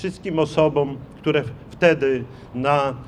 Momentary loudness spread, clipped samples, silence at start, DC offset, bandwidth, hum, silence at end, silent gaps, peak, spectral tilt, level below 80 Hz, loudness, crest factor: 9 LU; under 0.1%; 0 s; under 0.1%; 10.5 kHz; none; 0 s; none; -2 dBFS; -6.5 dB/octave; -50 dBFS; -21 LUFS; 20 dB